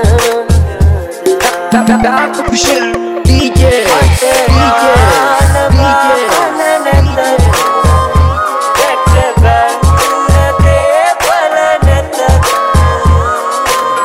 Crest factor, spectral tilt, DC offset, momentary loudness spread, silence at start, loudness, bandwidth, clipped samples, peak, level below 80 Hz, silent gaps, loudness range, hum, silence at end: 8 dB; -5 dB/octave; 0.6%; 4 LU; 0 s; -9 LUFS; 16.5 kHz; under 0.1%; 0 dBFS; -16 dBFS; none; 2 LU; none; 0 s